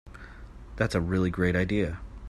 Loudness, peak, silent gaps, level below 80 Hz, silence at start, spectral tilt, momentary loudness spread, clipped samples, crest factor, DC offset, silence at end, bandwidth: -28 LUFS; -10 dBFS; none; -44 dBFS; 0.05 s; -7 dB/octave; 21 LU; under 0.1%; 20 dB; under 0.1%; 0 s; 12.5 kHz